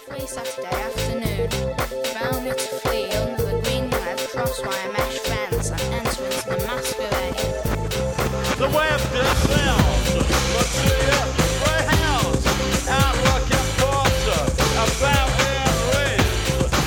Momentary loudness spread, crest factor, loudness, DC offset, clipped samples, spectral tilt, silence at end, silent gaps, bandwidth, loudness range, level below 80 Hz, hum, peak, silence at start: 7 LU; 18 dB; -21 LUFS; under 0.1%; under 0.1%; -4 dB/octave; 0 s; none; 19.5 kHz; 5 LU; -28 dBFS; none; -2 dBFS; 0 s